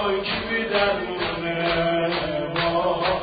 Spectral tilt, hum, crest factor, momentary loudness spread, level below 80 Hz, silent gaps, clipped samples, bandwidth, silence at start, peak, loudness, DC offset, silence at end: -10 dB/octave; none; 16 dB; 4 LU; -46 dBFS; none; under 0.1%; 5 kHz; 0 s; -8 dBFS; -23 LUFS; under 0.1%; 0 s